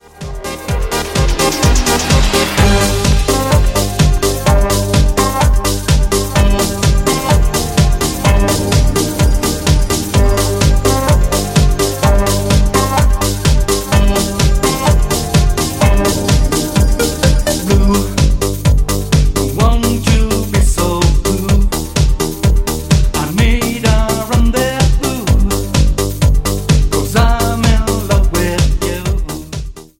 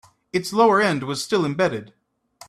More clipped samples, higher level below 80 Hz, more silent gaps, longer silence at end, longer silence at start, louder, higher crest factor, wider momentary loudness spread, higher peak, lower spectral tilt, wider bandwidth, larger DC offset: neither; first, -14 dBFS vs -62 dBFS; neither; second, 0.15 s vs 0.6 s; second, 0.2 s vs 0.35 s; first, -13 LUFS vs -21 LUFS; about the same, 12 dB vs 16 dB; second, 3 LU vs 11 LU; first, 0 dBFS vs -6 dBFS; about the same, -5 dB/octave vs -5 dB/octave; first, 17 kHz vs 14.5 kHz; neither